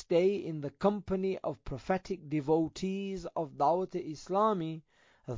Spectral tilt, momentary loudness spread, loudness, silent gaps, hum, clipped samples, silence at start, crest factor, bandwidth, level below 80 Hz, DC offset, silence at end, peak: -7 dB/octave; 10 LU; -33 LUFS; none; none; under 0.1%; 0 s; 18 dB; 7.6 kHz; -58 dBFS; under 0.1%; 0 s; -16 dBFS